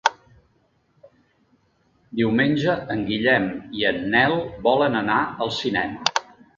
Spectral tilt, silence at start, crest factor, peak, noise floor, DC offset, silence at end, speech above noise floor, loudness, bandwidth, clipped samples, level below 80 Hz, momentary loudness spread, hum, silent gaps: -4.5 dB/octave; 0.05 s; 22 dB; 0 dBFS; -64 dBFS; under 0.1%; 0.35 s; 43 dB; -22 LUFS; 7.6 kHz; under 0.1%; -54 dBFS; 6 LU; none; none